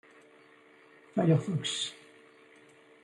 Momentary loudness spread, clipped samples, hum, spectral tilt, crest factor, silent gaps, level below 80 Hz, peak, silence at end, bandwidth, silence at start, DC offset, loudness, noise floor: 10 LU; under 0.1%; none; -5.5 dB/octave; 20 dB; none; -76 dBFS; -14 dBFS; 1.1 s; 11.5 kHz; 1.15 s; under 0.1%; -30 LUFS; -59 dBFS